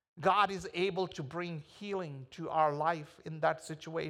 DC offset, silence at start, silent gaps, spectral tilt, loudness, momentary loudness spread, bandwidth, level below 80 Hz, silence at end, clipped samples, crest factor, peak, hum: under 0.1%; 0.15 s; none; -5.5 dB/octave; -34 LUFS; 13 LU; 12.5 kHz; -70 dBFS; 0 s; under 0.1%; 20 dB; -16 dBFS; none